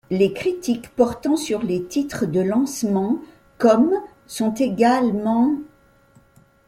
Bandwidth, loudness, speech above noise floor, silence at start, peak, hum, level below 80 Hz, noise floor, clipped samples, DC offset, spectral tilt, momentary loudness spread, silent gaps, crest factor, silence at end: 16 kHz; -21 LUFS; 35 dB; 0.1 s; -4 dBFS; none; -56 dBFS; -54 dBFS; under 0.1%; under 0.1%; -6 dB/octave; 8 LU; none; 18 dB; 1 s